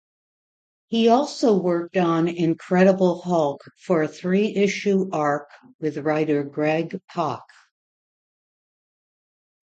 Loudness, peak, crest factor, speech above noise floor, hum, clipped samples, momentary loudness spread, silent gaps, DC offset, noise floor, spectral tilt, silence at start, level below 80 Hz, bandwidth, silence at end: -22 LUFS; -4 dBFS; 20 dB; over 69 dB; none; under 0.1%; 9 LU; 5.74-5.79 s; under 0.1%; under -90 dBFS; -6.5 dB/octave; 0.9 s; -70 dBFS; 8.8 kHz; 2.3 s